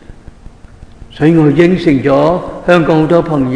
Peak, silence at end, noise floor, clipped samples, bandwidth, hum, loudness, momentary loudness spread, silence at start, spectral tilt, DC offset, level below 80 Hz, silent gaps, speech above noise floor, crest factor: 0 dBFS; 0 s; -35 dBFS; 0.7%; 10 kHz; none; -10 LUFS; 5 LU; 0.1 s; -8 dB/octave; 0.2%; -34 dBFS; none; 25 dB; 12 dB